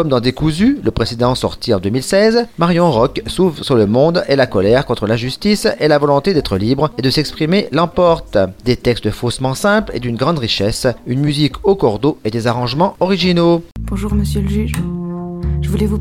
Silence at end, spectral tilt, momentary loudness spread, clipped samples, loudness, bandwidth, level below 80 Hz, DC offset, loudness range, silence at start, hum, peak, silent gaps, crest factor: 0 s; -6 dB/octave; 6 LU; under 0.1%; -15 LUFS; 16 kHz; -30 dBFS; under 0.1%; 3 LU; 0 s; none; 0 dBFS; none; 14 dB